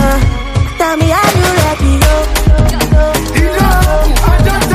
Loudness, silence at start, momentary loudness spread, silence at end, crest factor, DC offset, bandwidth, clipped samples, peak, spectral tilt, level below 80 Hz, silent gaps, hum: -11 LUFS; 0 s; 4 LU; 0 s; 8 dB; under 0.1%; 16 kHz; under 0.1%; 0 dBFS; -5 dB/octave; -12 dBFS; none; none